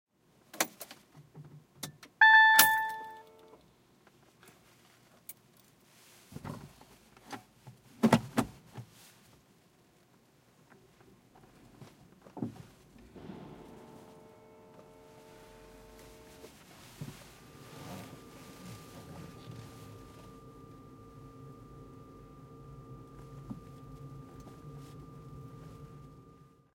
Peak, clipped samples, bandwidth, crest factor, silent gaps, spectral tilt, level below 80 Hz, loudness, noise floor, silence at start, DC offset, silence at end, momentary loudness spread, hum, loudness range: -4 dBFS; under 0.1%; 16.5 kHz; 32 dB; none; -3 dB/octave; -64 dBFS; -25 LUFS; -65 dBFS; 0.55 s; under 0.1%; 0.9 s; 26 LU; none; 27 LU